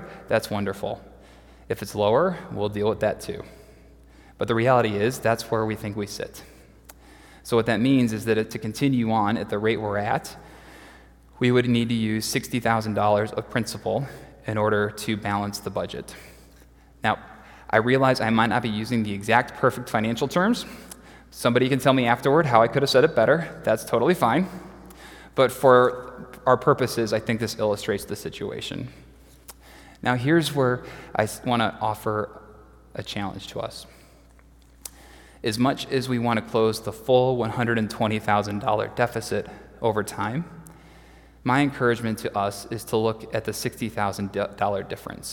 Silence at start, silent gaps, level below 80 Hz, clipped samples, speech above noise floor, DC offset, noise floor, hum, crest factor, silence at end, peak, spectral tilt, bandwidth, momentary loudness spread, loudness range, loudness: 0 s; none; -52 dBFS; under 0.1%; 29 dB; under 0.1%; -52 dBFS; none; 22 dB; 0 s; -2 dBFS; -5.5 dB/octave; 18 kHz; 15 LU; 7 LU; -24 LUFS